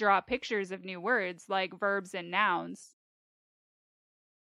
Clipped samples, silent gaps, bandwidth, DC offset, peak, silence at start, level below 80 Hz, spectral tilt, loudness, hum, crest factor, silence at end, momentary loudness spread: under 0.1%; none; 13 kHz; under 0.1%; -12 dBFS; 0 s; -70 dBFS; -4 dB/octave; -31 LUFS; none; 22 dB; 1.6 s; 9 LU